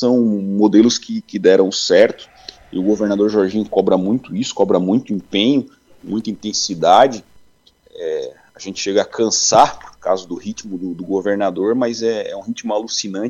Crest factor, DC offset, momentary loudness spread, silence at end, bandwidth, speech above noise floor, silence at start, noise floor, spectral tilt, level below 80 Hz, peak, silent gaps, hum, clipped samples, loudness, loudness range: 16 dB; under 0.1%; 15 LU; 0 s; 8.8 kHz; 36 dB; 0 s; -53 dBFS; -4 dB/octave; -56 dBFS; 0 dBFS; none; none; under 0.1%; -17 LUFS; 3 LU